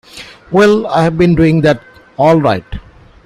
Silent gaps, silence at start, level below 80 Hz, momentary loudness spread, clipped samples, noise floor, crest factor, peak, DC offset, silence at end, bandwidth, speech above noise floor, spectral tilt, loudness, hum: none; 0.15 s; -36 dBFS; 21 LU; under 0.1%; -31 dBFS; 12 dB; 0 dBFS; under 0.1%; 0.45 s; 11.5 kHz; 22 dB; -7.5 dB/octave; -11 LUFS; none